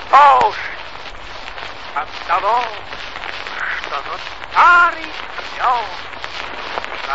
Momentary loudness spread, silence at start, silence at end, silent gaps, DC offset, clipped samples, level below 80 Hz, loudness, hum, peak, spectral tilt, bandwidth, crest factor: 19 LU; 0 s; 0 s; none; 2%; under 0.1%; -46 dBFS; -17 LUFS; none; 0 dBFS; -2.5 dB/octave; 8 kHz; 18 dB